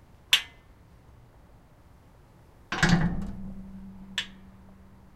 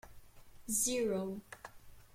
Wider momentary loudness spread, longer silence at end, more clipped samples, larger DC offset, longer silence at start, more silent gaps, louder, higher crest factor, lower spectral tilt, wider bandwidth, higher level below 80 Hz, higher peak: about the same, 21 LU vs 20 LU; about the same, 0.2 s vs 0.1 s; neither; neither; first, 0.3 s vs 0.05 s; neither; first, -27 LUFS vs -35 LUFS; first, 30 dB vs 18 dB; about the same, -4 dB/octave vs -3 dB/octave; about the same, 15.5 kHz vs 16.5 kHz; first, -42 dBFS vs -62 dBFS; first, -2 dBFS vs -22 dBFS